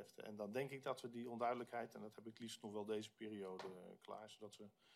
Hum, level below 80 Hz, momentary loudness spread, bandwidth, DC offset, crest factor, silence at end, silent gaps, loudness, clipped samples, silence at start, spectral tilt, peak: none; under -90 dBFS; 13 LU; 15 kHz; under 0.1%; 20 dB; 0 s; none; -50 LUFS; under 0.1%; 0 s; -5 dB/octave; -30 dBFS